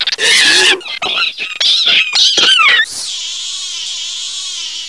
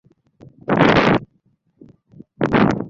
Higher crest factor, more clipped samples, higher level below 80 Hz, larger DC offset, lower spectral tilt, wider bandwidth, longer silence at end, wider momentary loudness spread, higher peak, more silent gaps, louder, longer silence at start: about the same, 14 dB vs 18 dB; neither; second, -60 dBFS vs -44 dBFS; first, 0.4% vs under 0.1%; second, 2 dB/octave vs -7 dB/octave; first, 12 kHz vs 7.6 kHz; about the same, 0 s vs 0 s; about the same, 12 LU vs 11 LU; about the same, 0 dBFS vs -2 dBFS; neither; first, -10 LUFS vs -17 LUFS; second, 0 s vs 0.7 s